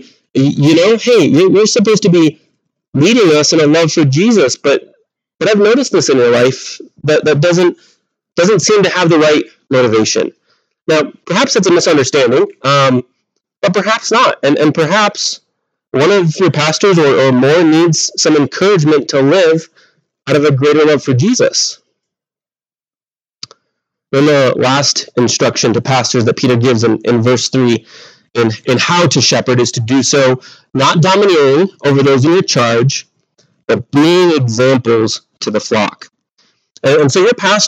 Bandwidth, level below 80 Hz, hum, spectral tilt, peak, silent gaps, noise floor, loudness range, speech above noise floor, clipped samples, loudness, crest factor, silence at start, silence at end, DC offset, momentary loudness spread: 10 kHz; -60 dBFS; none; -4.5 dB/octave; 0 dBFS; 2.88-2.92 s; under -90 dBFS; 3 LU; over 80 dB; under 0.1%; -10 LUFS; 12 dB; 0.35 s; 0 s; under 0.1%; 8 LU